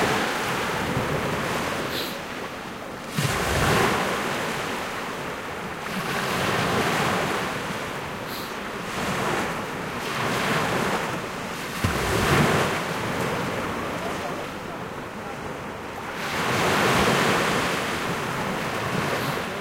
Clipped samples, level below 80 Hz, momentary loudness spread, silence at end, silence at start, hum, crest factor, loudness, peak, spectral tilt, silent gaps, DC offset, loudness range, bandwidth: under 0.1%; -46 dBFS; 12 LU; 0 s; 0 s; none; 18 dB; -25 LUFS; -8 dBFS; -4 dB/octave; none; under 0.1%; 4 LU; 16 kHz